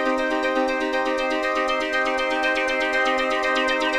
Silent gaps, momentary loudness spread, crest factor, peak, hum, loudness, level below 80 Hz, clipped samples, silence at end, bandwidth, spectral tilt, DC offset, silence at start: none; 2 LU; 14 dB; -8 dBFS; none; -22 LUFS; -48 dBFS; under 0.1%; 0 s; 13.5 kHz; -2 dB/octave; under 0.1%; 0 s